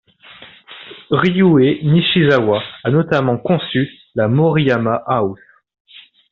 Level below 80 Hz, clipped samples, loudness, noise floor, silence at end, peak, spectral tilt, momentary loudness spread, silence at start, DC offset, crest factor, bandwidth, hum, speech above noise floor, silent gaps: -52 dBFS; under 0.1%; -15 LUFS; -42 dBFS; 0.95 s; -2 dBFS; -5.5 dB/octave; 10 LU; 0.4 s; under 0.1%; 14 dB; 6.6 kHz; none; 27 dB; none